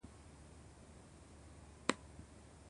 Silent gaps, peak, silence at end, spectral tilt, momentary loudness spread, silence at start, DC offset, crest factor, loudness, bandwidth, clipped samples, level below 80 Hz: none; -14 dBFS; 0 s; -3.5 dB/octave; 18 LU; 0 s; under 0.1%; 36 dB; -44 LUFS; 11 kHz; under 0.1%; -62 dBFS